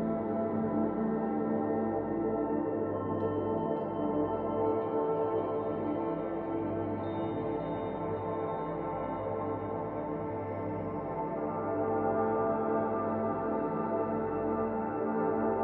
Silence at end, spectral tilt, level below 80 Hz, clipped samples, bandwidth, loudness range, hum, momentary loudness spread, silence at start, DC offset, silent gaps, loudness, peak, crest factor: 0 s; -8 dB/octave; -58 dBFS; under 0.1%; 4 kHz; 4 LU; none; 5 LU; 0 s; under 0.1%; none; -33 LUFS; -18 dBFS; 14 dB